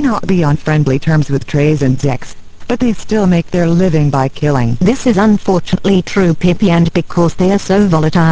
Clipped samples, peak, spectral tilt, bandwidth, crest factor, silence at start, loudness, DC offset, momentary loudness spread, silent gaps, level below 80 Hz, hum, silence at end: under 0.1%; 0 dBFS; -7 dB/octave; 8 kHz; 12 dB; 0 s; -12 LUFS; under 0.1%; 4 LU; none; -32 dBFS; none; 0 s